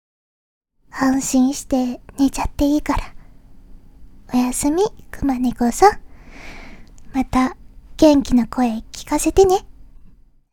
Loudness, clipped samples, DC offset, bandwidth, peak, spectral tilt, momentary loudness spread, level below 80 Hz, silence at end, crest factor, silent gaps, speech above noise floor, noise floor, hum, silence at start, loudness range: -18 LUFS; under 0.1%; under 0.1%; 18 kHz; 0 dBFS; -4.5 dB/octave; 12 LU; -36 dBFS; 0.7 s; 18 dB; none; 28 dB; -46 dBFS; none; 0.95 s; 4 LU